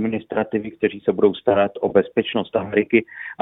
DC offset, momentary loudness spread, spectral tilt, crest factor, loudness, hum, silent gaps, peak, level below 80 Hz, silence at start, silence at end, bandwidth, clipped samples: under 0.1%; 6 LU; -10 dB/octave; 20 dB; -20 LUFS; none; none; -2 dBFS; -58 dBFS; 0 s; 0.05 s; 4 kHz; under 0.1%